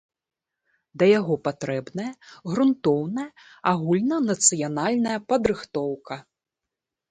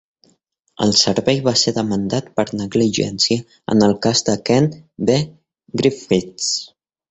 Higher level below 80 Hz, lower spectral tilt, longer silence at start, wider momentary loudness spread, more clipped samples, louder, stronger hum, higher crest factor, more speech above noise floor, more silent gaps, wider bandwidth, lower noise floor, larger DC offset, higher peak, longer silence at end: second, -60 dBFS vs -50 dBFS; about the same, -4.5 dB/octave vs -4.5 dB/octave; first, 0.95 s vs 0.8 s; first, 15 LU vs 7 LU; neither; second, -23 LUFS vs -18 LUFS; neither; about the same, 22 dB vs 18 dB; first, 63 dB vs 44 dB; neither; first, 9.6 kHz vs 8.4 kHz; first, -87 dBFS vs -62 dBFS; neither; about the same, -4 dBFS vs -2 dBFS; first, 0.9 s vs 0.45 s